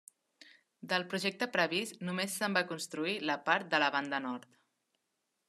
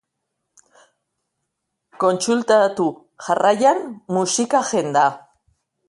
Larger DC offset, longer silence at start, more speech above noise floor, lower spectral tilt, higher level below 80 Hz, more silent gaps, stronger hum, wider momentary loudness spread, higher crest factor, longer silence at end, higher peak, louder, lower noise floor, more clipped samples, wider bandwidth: neither; second, 0.45 s vs 2 s; second, 49 dB vs 59 dB; about the same, -3.5 dB/octave vs -4 dB/octave; second, -88 dBFS vs -70 dBFS; neither; neither; about the same, 8 LU vs 8 LU; first, 24 dB vs 18 dB; first, 1.05 s vs 0.7 s; second, -12 dBFS vs -4 dBFS; second, -33 LUFS vs -19 LUFS; first, -83 dBFS vs -77 dBFS; neither; first, 13 kHz vs 11.5 kHz